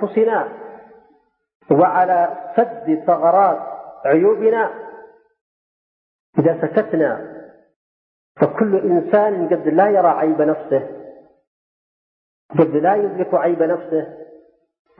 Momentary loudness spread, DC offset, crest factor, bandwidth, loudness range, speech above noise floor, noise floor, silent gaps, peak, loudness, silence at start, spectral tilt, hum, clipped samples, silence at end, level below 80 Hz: 14 LU; under 0.1%; 16 dB; 4.2 kHz; 4 LU; 42 dB; -58 dBFS; 1.55-1.60 s, 5.41-6.33 s, 7.76-8.35 s, 11.47-12.49 s; -2 dBFS; -17 LUFS; 0 s; -12.5 dB/octave; none; under 0.1%; 0.75 s; -68 dBFS